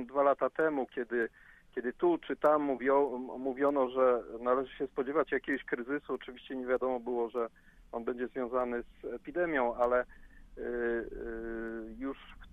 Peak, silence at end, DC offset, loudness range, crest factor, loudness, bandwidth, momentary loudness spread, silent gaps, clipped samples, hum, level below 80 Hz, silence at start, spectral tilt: -14 dBFS; 0.05 s; under 0.1%; 5 LU; 18 dB; -33 LUFS; 4 kHz; 12 LU; none; under 0.1%; none; -58 dBFS; 0 s; -7 dB/octave